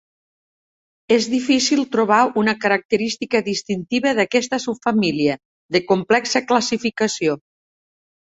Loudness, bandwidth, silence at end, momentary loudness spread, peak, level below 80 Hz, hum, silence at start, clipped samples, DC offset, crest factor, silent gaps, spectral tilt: -19 LUFS; 8.2 kHz; 0.9 s; 6 LU; -2 dBFS; -62 dBFS; none; 1.1 s; under 0.1%; under 0.1%; 18 dB; 2.85-2.89 s, 5.45-5.69 s; -4 dB/octave